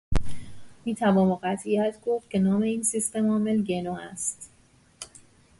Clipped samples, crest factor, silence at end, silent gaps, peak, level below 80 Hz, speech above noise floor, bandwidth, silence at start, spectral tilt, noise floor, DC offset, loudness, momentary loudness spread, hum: under 0.1%; 14 dB; 0.55 s; none; -12 dBFS; -40 dBFS; 29 dB; 11.5 kHz; 0.1 s; -5.5 dB/octave; -54 dBFS; under 0.1%; -26 LUFS; 20 LU; none